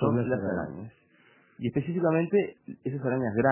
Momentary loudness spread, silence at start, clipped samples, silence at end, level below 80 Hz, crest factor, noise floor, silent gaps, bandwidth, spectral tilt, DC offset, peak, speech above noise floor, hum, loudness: 13 LU; 0 s; under 0.1%; 0 s; -58 dBFS; 20 dB; -61 dBFS; none; 3.2 kHz; -12 dB/octave; under 0.1%; -10 dBFS; 33 dB; none; -29 LUFS